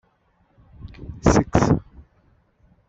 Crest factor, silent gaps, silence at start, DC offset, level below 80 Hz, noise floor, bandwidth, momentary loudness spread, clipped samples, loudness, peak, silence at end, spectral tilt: 22 dB; none; 0.85 s; under 0.1%; -36 dBFS; -63 dBFS; 8.2 kHz; 22 LU; under 0.1%; -20 LUFS; -2 dBFS; 1.1 s; -6.5 dB/octave